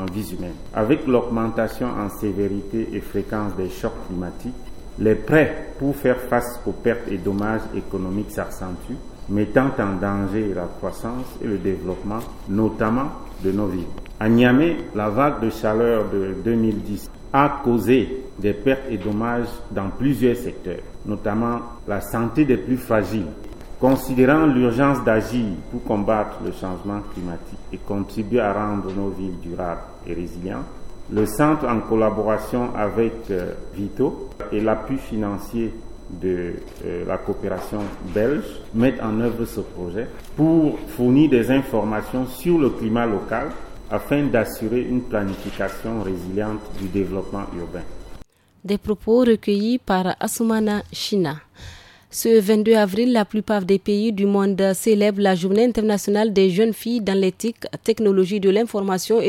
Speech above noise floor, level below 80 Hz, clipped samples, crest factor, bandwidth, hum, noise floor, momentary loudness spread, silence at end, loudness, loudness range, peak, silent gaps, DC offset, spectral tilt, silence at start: 23 dB; -40 dBFS; under 0.1%; 20 dB; 17 kHz; none; -43 dBFS; 13 LU; 0 s; -22 LUFS; 7 LU; 0 dBFS; none; under 0.1%; -6.5 dB/octave; 0 s